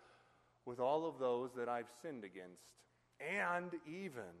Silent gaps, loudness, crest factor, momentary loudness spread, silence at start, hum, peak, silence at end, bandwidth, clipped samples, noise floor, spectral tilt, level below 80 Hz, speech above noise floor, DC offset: none; -42 LUFS; 18 dB; 16 LU; 0 s; none; -26 dBFS; 0 s; 13 kHz; under 0.1%; -72 dBFS; -5.5 dB/octave; -86 dBFS; 30 dB; under 0.1%